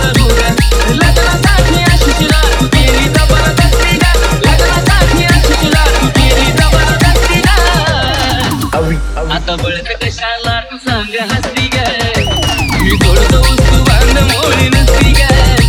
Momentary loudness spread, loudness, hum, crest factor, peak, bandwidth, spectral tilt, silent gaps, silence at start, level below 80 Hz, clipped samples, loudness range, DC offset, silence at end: 7 LU; -10 LUFS; none; 8 dB; 0 dBFS; 18 kHz; -4.5 dB/octave; none; 0 s; -12 dBFS; under 0.1%; 5 LU; under 0.1%; 0 s